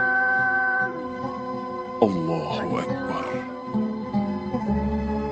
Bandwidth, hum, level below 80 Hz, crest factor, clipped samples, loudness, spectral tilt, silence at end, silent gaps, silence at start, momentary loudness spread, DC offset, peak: 8.4 kHz; none; -42 dBFS; 22 dB; under 0.1%; -25 LUFS; -7 dB/octave; 0 s; none; 0 s; 11 LU; under 0.1%; -4 dBFS